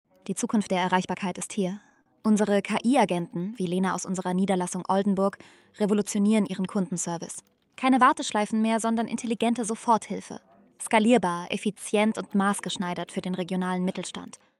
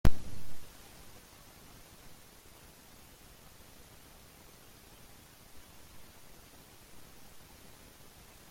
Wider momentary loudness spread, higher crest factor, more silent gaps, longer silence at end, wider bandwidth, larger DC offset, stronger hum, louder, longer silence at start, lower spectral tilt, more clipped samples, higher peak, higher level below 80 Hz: first, 10 LU vs 3 LU; second, 18 dB vs 24 dB; neither; second, 0.35 s vs 2.5 s; second, 12.5 kHz vs 16.5 kHz; neither; neither; first, -26 LUFS vs -51 LUFS; first, 0.25 s vs 0.05 s; about the same, -5 dB/octave vs -5.5 dB/octave; neither; about the same, -8 dBFS vs -10 dBFS; second, -70 dBFS vs -46 dBFS